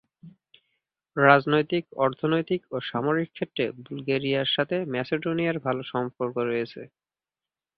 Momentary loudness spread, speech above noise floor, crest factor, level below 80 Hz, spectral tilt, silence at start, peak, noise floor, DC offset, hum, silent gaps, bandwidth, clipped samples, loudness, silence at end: 11 LU; over 64 dB; 26 dB; -66 dBFS; -9 dB/octave; 0.25 s; -2 dBFS; under -90 dBFS; under 0.1%; none; none; 5.8 kHz; under 0.1%; -26 LUFS; 0.9 s